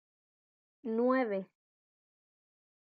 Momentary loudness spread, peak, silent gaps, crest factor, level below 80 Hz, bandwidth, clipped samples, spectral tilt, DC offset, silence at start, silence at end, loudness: 17 LU; -18 dBFS; none; 20 dB; under -90 dBFS; 4.9 kHz; under 0.1%; -9.5 dB/octave; under 0.1%; 0.85 s; 1.4 s; -33 LUFS